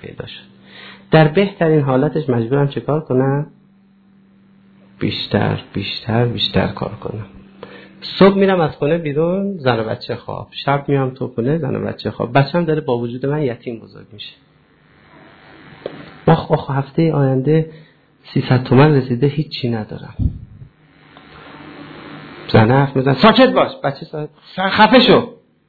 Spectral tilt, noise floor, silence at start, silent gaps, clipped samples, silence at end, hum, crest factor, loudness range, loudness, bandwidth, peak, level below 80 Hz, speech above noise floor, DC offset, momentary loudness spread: -9.5 dB/octave; -52 dBFS; 0 s; none; under 0.1%; 0.35 s; none; 18 dB; 7 LU; -16 LUFS; 4.8 kHz; 0 dBFS; -42 dBFS; 36 dB; under 0.1%; 21 LU